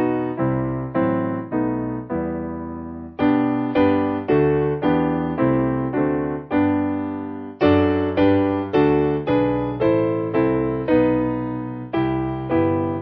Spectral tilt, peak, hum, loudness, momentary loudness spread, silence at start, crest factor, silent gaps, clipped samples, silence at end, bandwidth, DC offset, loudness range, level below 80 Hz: -10.5 dB/octave; -4 dBFS; none; -21 LUFS; 8 LU; 0 s; 16 dB; none; under 0.1%; 0 s; 5.4 kHz; under 0.1%; 3 LU; -42 dBFS